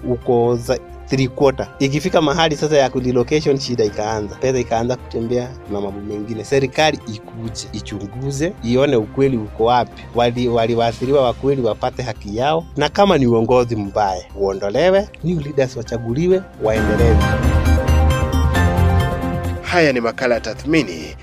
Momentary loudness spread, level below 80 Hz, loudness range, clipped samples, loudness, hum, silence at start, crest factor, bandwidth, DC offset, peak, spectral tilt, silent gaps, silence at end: 10 LU; -28 dBFS; 4 LU; under 0.1%; -18 LUFS; none; 0 s; 16 dB; 15 kHz; under 0.1%; 0 dBFS; -6 dB/octave; none; 0 s